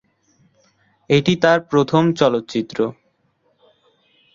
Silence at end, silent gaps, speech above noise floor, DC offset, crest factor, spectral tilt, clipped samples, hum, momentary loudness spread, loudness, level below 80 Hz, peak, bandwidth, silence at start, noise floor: 1.4 s; none; 47 dB; under 0.1%; 20 dB; -6.5 dB/octave; under 0.1%; none; 9 LU; -18 LUFS; -58 dBFS; -2 dBFS; 7.6 kHz; 1.1 s; -64 dBFS